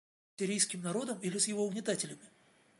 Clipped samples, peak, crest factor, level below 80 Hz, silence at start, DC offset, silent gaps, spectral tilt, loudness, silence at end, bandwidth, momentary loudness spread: under 0.1%; -14 dBFS; 22 dB; -84 dBFS; 0.4 s; under 0.1%; none; -3 dB/octave; -34 LUFS; 0.5 s; 11.5 kHz; 8 LU